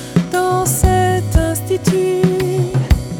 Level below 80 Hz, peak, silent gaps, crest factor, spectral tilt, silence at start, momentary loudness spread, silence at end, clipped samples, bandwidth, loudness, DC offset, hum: -22 dBFS; 0 dBFS; none; 14 dB; -6 dB/octave; 0 s; 4 LU; 0 s; under 0.1%; 18.5 kHz; -16 LUFS; under 0.1%; none